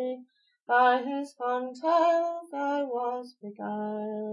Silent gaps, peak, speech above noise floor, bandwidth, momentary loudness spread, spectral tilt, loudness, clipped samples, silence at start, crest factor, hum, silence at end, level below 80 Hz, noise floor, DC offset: 0.62-0.66 s; -10 dBFS; 28 dB; 11.5 kHz; 13 LU; -5.5 dB/octave; -28 LUFS; under 0.1%; 0 s; 18 dB; none; 0 s; under -90 dBFS; -56 dBFS; under 0.1%